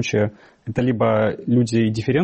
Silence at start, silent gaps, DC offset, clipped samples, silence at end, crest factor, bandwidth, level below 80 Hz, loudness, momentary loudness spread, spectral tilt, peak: 0 s; none; under 0.1%; under 0.1%; 0 s; 12 dB; 8.4 kHz; -52 dBFS; -20 LUFS; 8 LU; -7 dB/octave; -8 dBFS